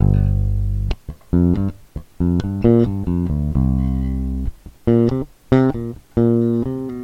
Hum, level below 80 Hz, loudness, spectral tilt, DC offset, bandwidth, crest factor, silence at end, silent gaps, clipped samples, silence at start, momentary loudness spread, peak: none; -26 dBFS; -19 LUFS; -10 dB/octave; under 0.1%; 7 kHz; 18 dB; 0 s; none; under 0.1%; 0 s; 10 LU; 0 dBFS